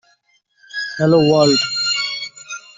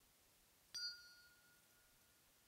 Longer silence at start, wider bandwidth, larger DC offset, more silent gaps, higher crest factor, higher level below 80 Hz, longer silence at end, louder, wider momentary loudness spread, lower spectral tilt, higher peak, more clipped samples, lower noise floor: first, 0.75 s vs 0 s; second, 7.8 kHz vs 16 kHz; neither; neither; second, 16 dB vs 22 dB; first, -56 dBFS vs -86 dBFS; first, 0.2 s vs 0 s; first, -16 LUFS vs -50 LUFS; second, 16 LU vs 20 LU; first, -4.5 dB/octave vs 1.5 dB/octave; first, -2 dBFS vs -38 dBFS; neither; second, -60 dBFS vs -74 dBFS